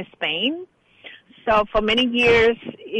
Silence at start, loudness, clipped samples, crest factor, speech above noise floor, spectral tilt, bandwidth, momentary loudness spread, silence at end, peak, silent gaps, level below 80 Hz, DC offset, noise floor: 0 s; -19 LUFS; under 0.1%; 14 dB; 25 dB; -5 dB/octave; 9 kHz; 15 LU; 0 s; -8 dBFS; none; -44 dBFS; under 0.1%; -45 dBFS